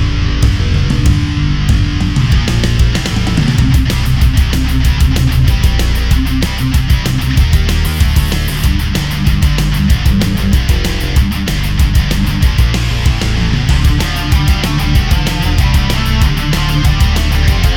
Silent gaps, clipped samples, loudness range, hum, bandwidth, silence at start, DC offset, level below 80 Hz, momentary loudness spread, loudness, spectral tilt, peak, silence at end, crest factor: none; under 0.1%; 1 LU; none; 17.5 kHz; 0 s; under 0.1%; -14 dBFS; 3 LU; -13 LUFS; -5.5 dB/octave; 0 dBFS; 0 s; 10 dB